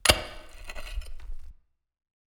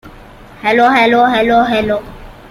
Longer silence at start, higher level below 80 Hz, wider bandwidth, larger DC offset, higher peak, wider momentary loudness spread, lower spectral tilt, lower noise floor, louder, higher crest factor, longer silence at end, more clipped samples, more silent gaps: about the same, 0.05 s vs 0.05 s; about the same, -38 dBFS vs -40 dBFS; first, over 20 kHz vs 15 kHz; neither; about the same, 0 dBFS vs -2 dBFS; first, 22 LU vs 10 LU; second, -2 dB/octave vs -5.5 dB/octave; first, -53 dBFS vs -36 dBFS; second, -30 LUFS vs -12 LUFS; first, 30 dB vs 12 dB; first, 0.75 s vs 0.05 s; neither; neither